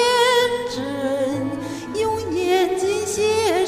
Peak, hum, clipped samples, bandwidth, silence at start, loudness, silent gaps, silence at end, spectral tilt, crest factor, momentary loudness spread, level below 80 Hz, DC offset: -6 dBFS; none; under 0.1%; 15.5 kHz; 0 s; -21 LUFS; none; 0 s; -3.5 dB/octave; 14 dB; 9 LU; -52 dBFS; under 0.1%